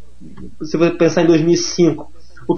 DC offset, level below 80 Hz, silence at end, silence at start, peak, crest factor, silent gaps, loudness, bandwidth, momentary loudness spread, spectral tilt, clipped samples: 3%; -46 dBFS; 0 s; 0.2 s; -2 dBFS; 14 dB; none; -15 LUFS; 7 kHz; 17 LU; -5.5 dB/octave; under 0.1%